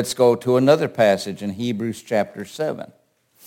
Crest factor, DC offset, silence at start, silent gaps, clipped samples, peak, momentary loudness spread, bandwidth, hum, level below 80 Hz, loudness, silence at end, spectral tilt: 18 dB; under 0.1%; 0 s; none; under 0.1%; -2 dBFS; 12 LU; 17 kHz; none; -66 dBFS; -20 LUFS; 0.6 s; -5.5 dB/octave